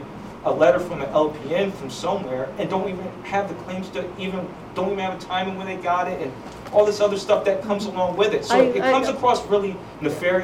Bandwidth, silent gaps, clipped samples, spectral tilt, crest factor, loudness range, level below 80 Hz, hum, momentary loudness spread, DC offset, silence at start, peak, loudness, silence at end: 15.5 kHz; none; under 0.1%; -5 dB/octave; 16 dB; 7 LU; -52 dBFS; none; 12 LU; under 0.1%; 0 s; -6 dBFS; -23 LUFS; 0 s